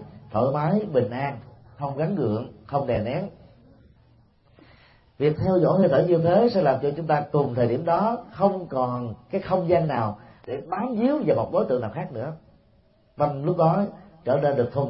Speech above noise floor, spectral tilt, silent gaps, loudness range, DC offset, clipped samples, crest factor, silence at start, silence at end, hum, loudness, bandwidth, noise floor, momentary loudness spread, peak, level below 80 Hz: 37 dB; -12.5 dB/octave; none; 8 LU; under 0.1%; under 0.1%; 18 dB; 0 s; 0 s; none; -24 LUFS; 5.8 kHz; -59 dBFS; 12 LU; -6 dBFS; -56 dBFS